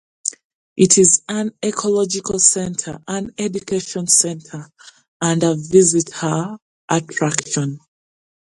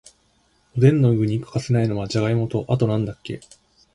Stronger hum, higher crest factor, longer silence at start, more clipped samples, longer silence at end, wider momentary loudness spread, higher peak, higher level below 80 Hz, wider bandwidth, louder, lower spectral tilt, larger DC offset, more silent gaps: neither; about the same, 20 dB vs 18 dB; second, 0.25 s vs 0.75 s; neither; first, 0.75 s vs 0.55 s; about the same, 14 LU vs 15 LU; first, 0 dBFS vs -4 dBFS; second, -56 dBFS vs -50 dBFS; about the same, 11.5 kHz vs 11 kHz; first, -17 LUFS vs -21 LUFS; second, -3.5 dB/octave vs -8 dB/octave; neither; first, 0.44-0.76 s, 5.08-5.20 s, 6.62-6.88 s vs none